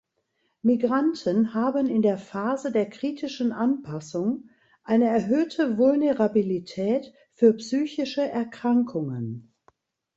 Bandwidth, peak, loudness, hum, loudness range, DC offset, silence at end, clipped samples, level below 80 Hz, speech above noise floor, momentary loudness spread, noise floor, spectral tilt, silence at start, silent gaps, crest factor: 7.8 kHz; -6 dBFS; -25 LUFS; none; 3 LU; under 0.1%; 0.75 s; under 0.1%; -68 dBFS; 50 dB; 9 LU; -74 dBFS; -7 dB/octave; 0.65 s; none; 18 dB